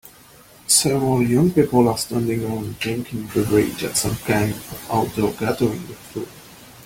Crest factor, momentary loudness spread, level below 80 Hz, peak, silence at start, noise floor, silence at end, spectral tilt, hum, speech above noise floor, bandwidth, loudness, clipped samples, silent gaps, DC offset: 18 dB; 16 LU; -48 dBFS; -2 dBFS; 0.05 s; -47 dBFS; 0 s; -4.5 dB/octave; none; 27 dB; 17 kHz; -20 LUFS; under 0.1%; none; under 0.1%